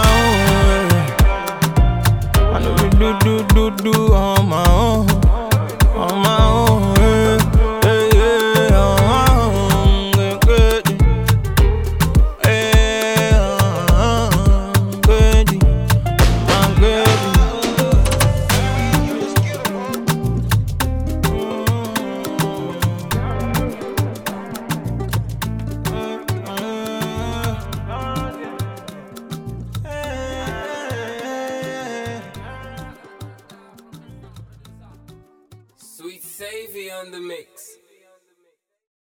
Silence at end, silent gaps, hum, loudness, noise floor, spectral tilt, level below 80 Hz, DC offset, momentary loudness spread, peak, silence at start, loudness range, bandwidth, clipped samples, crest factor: 1.5 s; none; none; -16 LUFS; -66 dBFS; -5.5 dB/octave; -20 dBFS; under 0.1%; 16 LU; -2 dBFS; 0 s; 16 LU; 19.5 kHz; under 0.1%; 14 dB